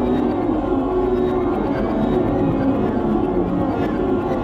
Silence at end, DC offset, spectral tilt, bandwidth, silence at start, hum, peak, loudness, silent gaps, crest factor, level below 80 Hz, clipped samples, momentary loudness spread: 0 s; under 0.1%; -9.5 dB/octave; 6.2 kHz; 0 s; none; -8 dBFS; -20 LUFS; none; 12 dB; -34 dBFS; under 0.1%; 2 LU